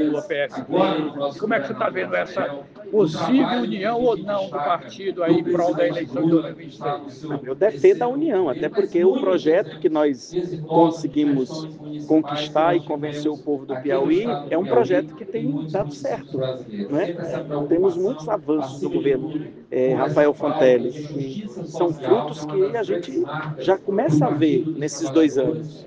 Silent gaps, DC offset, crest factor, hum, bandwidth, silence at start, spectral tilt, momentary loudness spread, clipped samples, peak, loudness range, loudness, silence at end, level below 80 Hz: none; under 0.1%; 18 dB; none; 8 kHz; 0 s; -6.5 dB/octave; 10 LU; under 0.1%; -2 dBFS; 3 LU; -22 LUFS; 0 s; -62 dBFS